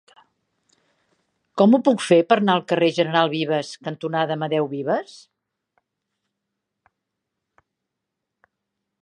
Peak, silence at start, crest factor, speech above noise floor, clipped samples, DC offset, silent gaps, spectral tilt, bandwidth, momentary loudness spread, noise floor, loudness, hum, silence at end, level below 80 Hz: -2 dBFS; 1.55 s; 22 dB; 62 dB; under 0.1%; under 0.1%; none; -6 dB/octave; 11 kHz; 11 LU; -82 dBFS; -20 LUFS; none; 3.85 s; -76 dBFS